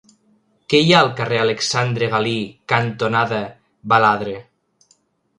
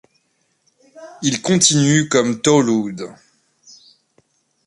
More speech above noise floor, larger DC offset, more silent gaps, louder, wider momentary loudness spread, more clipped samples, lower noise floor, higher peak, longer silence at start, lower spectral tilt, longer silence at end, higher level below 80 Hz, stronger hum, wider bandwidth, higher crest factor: second, 43 dB vs 49 dB; neither; neither; about the same, -17 LUFS vs -16 LUFS; about the same, 13 LU vs 15 LU; neither; second, -61 dBFS vs -66 dBFS; about the same, 0 dBFS vs 0 dBFS; second, 0.7 s vs 0.95 s; about the same, -4.5 dB/octave vs -4 dB/octave; second, 0.95 s vs 1.55 s; about the same, -58 dBFS vs -58 dBFS; neither; about the same, 11.5 kHz vs 11.5 kHz; about the same, 20 dB vs 20 dB